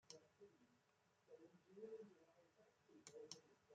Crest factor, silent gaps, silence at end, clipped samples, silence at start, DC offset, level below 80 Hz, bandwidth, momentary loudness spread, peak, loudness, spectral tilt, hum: 30 dB; none; 0 s; under 0.1%; 0.05 s; under 0.1%; under -90 dBFS; 8.8 kHz; 9 LU; -36 dBFS; -62 LUFS; -3 dB/octave; none